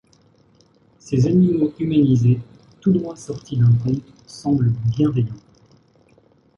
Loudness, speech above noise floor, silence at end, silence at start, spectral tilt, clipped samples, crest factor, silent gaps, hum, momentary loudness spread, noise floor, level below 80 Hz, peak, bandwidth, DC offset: -19 LUFS; 38 dB; 1.2 s; 1.05 s; -9 dB/octave; under 0.1%; 14 dB; none; none; 12 LU; -56 dBFS; -50 dBFS; -6 dBFS; 7.6 kHz; under 0.1%